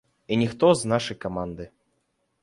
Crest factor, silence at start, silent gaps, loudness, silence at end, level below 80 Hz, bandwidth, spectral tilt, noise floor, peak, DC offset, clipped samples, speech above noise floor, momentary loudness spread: 20 dB; 0.3 s; none; -24 LUFS; 0.75 s; -54 dBFS; 11.5 kHz; -5.5 dB/octave; -73 dBFS; -6 dBFS; under 0.1%; under 0.1%; 49 dB; 17 LU